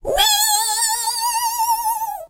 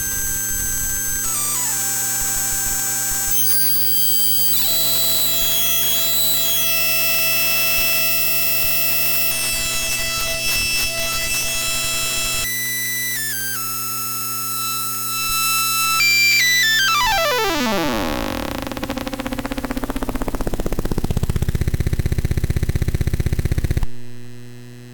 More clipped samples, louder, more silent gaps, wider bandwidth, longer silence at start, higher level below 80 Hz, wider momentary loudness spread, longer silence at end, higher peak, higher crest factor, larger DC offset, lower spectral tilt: neither; about the same, -17 LUFS vs -17 LUFS; neither; second, 16 kHz vs 19.5 kHz; about the same, 0.05 s vs 0 s; second, -42 dBFS vs -30 dBFS; second, 6 LU vs 12 LU; about the same, 0.05 s vs 0 s; about the same, -2 dBFS vs -4 dBFS; about the same, 18 dB vs 14 dB; neither; second, 1.5 dB/octave vs -2 dB/octave